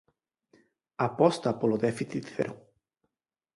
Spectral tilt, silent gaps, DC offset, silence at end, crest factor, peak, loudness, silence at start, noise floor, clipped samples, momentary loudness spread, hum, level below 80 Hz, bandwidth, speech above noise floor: -6.5 dB/octave; none; under 0.1%; 0.95 s; 22 dB; -8 dBFS; -29 LUFS; 1 s; -86 dBFS; under 0.1%; 10 LU; none; -70 dBFS; 11.5 kHz; 59 dB